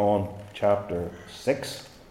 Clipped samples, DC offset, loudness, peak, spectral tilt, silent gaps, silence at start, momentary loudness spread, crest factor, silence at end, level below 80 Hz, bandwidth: under 0.1%; under 0.1%; -28 LUFS; -10 dBFS; -6 dB/octave; none; 0 s; 12 LU; 18 dB; 0.1 s; -58 dBFS; 16.5 kHz